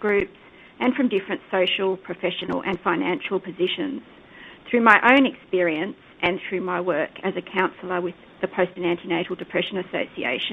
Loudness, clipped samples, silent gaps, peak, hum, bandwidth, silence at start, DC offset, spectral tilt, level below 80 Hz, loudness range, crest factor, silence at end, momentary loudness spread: -23 LUFS; under 0.1%; none; 0 dBFS; none; 7.6 kHz; 0 s; under 0.1%; -6.5 dB/octave; -60 dBFS; 5 LU; 24 dB; 0 s; 11 LU